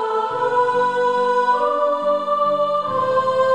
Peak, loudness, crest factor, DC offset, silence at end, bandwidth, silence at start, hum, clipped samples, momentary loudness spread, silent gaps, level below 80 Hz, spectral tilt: -6 dBFS; -19 LUFS; 12 dB; 0.3%; 0 s; 10 kHz; 0 s; none; under 0.1%; 2 LU; none; -66 dBFS; -5 dB/octave